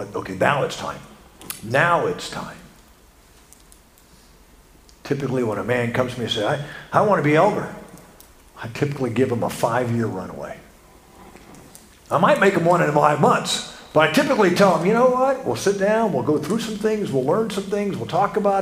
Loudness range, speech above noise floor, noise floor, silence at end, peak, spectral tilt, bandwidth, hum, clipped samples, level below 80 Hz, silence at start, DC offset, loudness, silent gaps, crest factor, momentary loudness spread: 9 LU; 31 dB; -51 dBFS; 0 s; 0 dBFS; -5.5 dB/octave; 15.5 kHz; none; under 0.1%; -54 dBFS; 0 s; under 0.1%; -20 LUFS; none; 20 dB; 16 LU